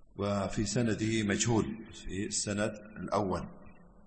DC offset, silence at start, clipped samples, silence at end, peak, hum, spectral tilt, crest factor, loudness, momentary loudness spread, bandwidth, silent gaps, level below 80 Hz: under 0.1%; 0 s; under 0.1%; 0 s; -16 dBFS; none; -4.5 dB/octave; 18 dB; -32 LUFS; 11 LU; 8.8 kHz; none; -52 dBFS